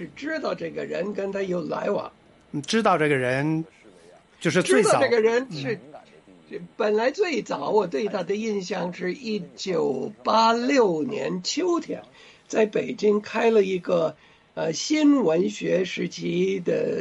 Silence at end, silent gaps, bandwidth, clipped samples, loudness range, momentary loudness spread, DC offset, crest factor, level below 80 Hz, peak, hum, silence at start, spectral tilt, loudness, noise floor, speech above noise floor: 0 s; none; 11.5 kHz; under 0.1%; 3 LU; 11 LU; under 0.1%; 16 dB; -68 dBFS; -8 dBFS; none; 0 s; -5 dB/octave; -24 LUFS; -52 dBFS; 29 dB